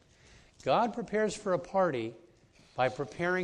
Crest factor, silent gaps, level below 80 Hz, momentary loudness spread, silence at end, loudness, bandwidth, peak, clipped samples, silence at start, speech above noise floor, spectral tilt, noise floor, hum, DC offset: 18 dB; none; -64 dBFS; 9 LU; 0 s; -32 LUFS; 10.5 kHz; -14 dBFS; under 0.1%; 0.65 s; 31 dB; -5.5 dB/octave; -61 dBFS; none; under 0.1%